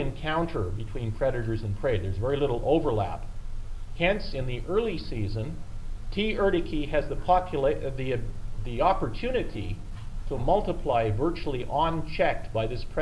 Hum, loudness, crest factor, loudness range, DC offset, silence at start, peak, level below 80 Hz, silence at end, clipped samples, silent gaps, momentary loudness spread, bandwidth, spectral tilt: none; -28 LUFS; 18 dB; 2 LU; under 0.1%; 0 s; -10 dBFS; -34 dBFS; 0 s; under 0.1%; none; 14 LU; 11 kHz; -7.5 dB/octave